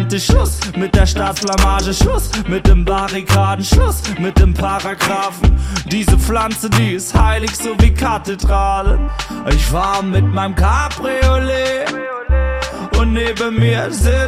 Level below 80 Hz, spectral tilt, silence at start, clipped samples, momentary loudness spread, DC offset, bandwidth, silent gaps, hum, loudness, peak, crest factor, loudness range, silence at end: -18 dBFS; -5 dB/octave; 0 s; under 0.1%; 5 LU; under 0.1%; 16 kHz; none; none; -15 LUFS; 0 dBFS; 14 dB; 2 LU; 0 s